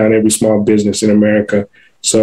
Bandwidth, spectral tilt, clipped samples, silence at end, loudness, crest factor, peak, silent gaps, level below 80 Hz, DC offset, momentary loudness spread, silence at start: 15.5 kHz; -4.5 dB/octave; under 0.1%; 0 s; -12 LUFS; 10 dB; 0 dBFS; none; -50 dBFS; under 0.1%; 7 LU; 0 s